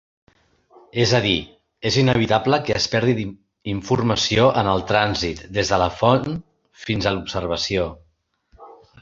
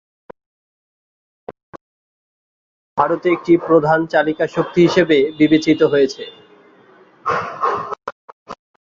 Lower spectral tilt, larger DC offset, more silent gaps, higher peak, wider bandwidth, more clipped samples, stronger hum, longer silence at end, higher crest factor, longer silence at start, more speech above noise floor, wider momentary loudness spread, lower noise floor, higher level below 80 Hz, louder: second, -5 dB/octave vs -6.5 dB/octave; neither; second, none vs 1.63-1.73 s, 1.81-2.96 s, 8.12-8.46 s; about the same, 0 dBFS vs -2 dBFS; about the same, 7.6 kHz vs 7.4 kHz; neither; neither; about the same, 0.3 s vs 0.3 s; about the same, 20 dB vs 18 dB; second, 0.95 s vs 1.5 s; first, 44 dB vs 33 dB; second, 12 LU vs 19 LU; first, -64 dBFS vs -49 dBFS; first, -44 dBFS vs -56 dBFS; second, -20 LUFS vs -16 LUFS